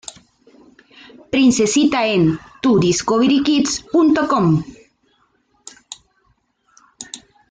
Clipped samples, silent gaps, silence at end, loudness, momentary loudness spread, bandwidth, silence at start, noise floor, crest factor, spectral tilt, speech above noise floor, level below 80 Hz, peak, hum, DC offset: under 0.1%; none; 0.35 s; -16 LUFS; 22 LU; 9.6 kHz; 1.35 s; -62 dBFS; 14 dB; -5 dB/octave; 47 dB; -52 dBFS; -4 dBFS; none; under 0.1%